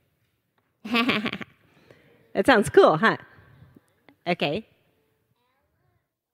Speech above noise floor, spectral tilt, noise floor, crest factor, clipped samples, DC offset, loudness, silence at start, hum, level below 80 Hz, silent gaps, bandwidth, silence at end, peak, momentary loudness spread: 51 dB; -5 dB/octave; -72 dBFS; 22 dB; under 0.1%; under 0.1%; -22 LUFS; 0.85 s; none; -60 dBFS; none; 15.5 kHz; 1.75 s; -4 dBFS; 19 LU